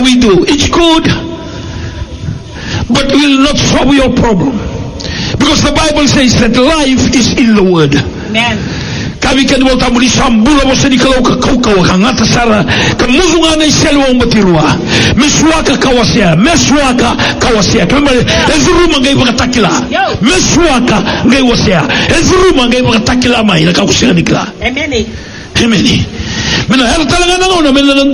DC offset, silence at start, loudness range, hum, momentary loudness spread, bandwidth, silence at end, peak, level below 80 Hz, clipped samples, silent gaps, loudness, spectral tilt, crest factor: under 0.1%; 0 s; 3 LU; none; 8 LU; 11 kHz; 0 s; 0 dBFS; -22 dBFS; 0.9%; none; -8 LUFS; -4 dB/octave; 8 dB